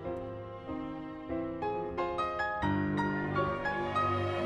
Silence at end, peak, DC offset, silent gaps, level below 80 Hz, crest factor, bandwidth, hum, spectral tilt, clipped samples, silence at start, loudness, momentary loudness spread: 0 s; -20 dBFS; under 0.1%; none; -54 dBFS; 14 dB; 10 kHz; none; -7.5 dB/octave; under 0.1%; 0 s; -34 LUFS; 10 LU